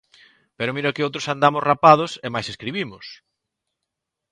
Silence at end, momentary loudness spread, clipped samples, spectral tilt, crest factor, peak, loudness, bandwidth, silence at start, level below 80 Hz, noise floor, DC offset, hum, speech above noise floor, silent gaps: 1.15 s; 15 LU; under 0.1%; -5 dB/octave; 22 dB; 0 dBFS; -20 LUFS; 10.5 kHz; 0.6 s; -62 dBFS; -82 dBFS; under 0.1%; none; 62 dB; none